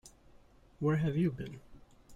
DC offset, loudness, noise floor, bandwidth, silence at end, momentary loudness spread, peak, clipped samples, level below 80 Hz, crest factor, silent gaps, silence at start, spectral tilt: under 0.1%; -33 LUFS; -60 dBFS; 10 kHz; 0 s; 15 LU; -20 dBFS; under 0.1%; -60 dBFS; 16 dB; none; 0.05 s; -8.5 dB/octave